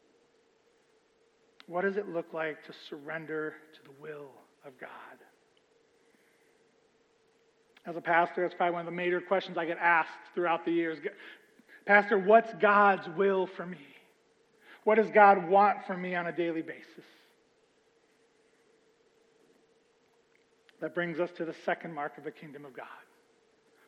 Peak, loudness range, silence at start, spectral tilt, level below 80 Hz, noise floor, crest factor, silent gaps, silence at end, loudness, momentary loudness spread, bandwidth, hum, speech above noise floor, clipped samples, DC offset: -8 dBFS; 16 LU; 1.7 s; -7 dB/octave; under -90 dBFS; -68 dBFS; 24 dB; none; 0.9 s; -28 LUFS; 24 LU; 8 kHz; none; 39 dB; under 0.1%; under 0.1%